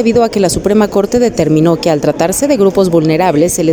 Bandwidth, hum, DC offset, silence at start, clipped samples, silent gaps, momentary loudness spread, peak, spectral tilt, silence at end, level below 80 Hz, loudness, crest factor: 19.5 kHz; none; under 0.1%; 0 s; under 0.1%; none; 2 LU; 0 dBFS; -5.5 dB/octave; 0 s; -36 dBFS; -11 LUFS; 10 dB